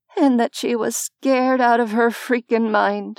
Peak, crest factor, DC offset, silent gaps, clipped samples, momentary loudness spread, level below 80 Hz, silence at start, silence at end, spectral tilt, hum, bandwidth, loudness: -4 dBFS; 14 dB; under 0.1%; none; under 0.1%; 6 LU; under -90 dBFS; 0.15 s; 0.05 s; -4 dB/octave; none; 16.5 kHz; -19 LUFS